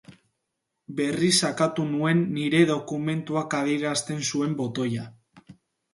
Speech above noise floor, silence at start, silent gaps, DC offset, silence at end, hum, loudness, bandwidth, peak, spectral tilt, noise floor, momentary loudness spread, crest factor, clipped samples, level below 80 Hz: 56 dB; 0.1 s; none; under 0.1%; 0.4 s; none; -25 LUFS; 11.5 kHz; -6 dBFS; -4.5 dB/octave; -81 dBFS; 8 LU; 20 dB; under 0.1%; -68 dBFS